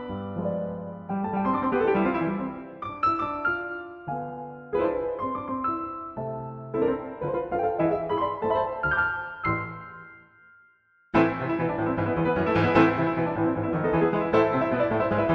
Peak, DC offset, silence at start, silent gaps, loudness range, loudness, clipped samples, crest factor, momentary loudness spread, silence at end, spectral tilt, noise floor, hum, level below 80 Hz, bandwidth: -6 dBFS; under 0.1%; 0 s; none; 6 LU; -26 LUFS; under 0.1%; 20 dB; 12 LU; 0 s; -9 dB/octave; -62 dBFS; none; -52 dBFS; 6.4 kHz